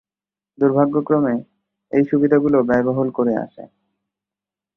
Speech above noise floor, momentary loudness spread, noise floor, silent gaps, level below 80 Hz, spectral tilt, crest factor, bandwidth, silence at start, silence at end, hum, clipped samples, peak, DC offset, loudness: over 73 dB; 7 LU; under -90 dBFS; none; -58 dBFS; -11 dB/octave; 16 dB; 3.2 kHz; 0.6 s; 1.1 s; 50 Hz at -50 dBFS; under 0.1%; -4 dBFS; under 0.1%; -18 LUFS